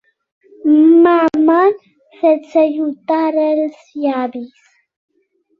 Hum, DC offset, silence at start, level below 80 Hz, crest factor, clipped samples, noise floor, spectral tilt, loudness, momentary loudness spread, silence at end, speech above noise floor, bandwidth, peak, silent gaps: none; under 0.1%; 0.65 s; -64 dBFS; 14 dB; under 0.1%; -62 dBFS; -6.5 dB/octave; -14 LUFS; 14 LU; 1.15 s; 49 dB; 5 kHz; -2 dBFS; none